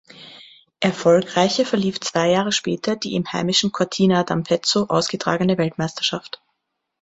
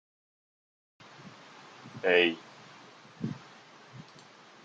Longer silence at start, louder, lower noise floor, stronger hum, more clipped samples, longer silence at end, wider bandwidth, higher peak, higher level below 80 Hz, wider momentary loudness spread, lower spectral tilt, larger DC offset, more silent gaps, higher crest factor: second, 0.15 s vs 1.25 s; first, -20 LUFS vs -28 LUFS; first, -76 dBFS vs -54 dBFS; neither; neither; about the same, 0.75 s vs 0.65 s; about the same, 8.2 kHz vs 7.8 kHz; first, -2 dBFS vs -10 dBFS; first, -58 dBFS vs -80 dBFS; second, 6 LU vs 28 LU; about the same, -4.5 dB/octave vs -5 dB/octave; neither; neither; second, 18 dB vs 26 dB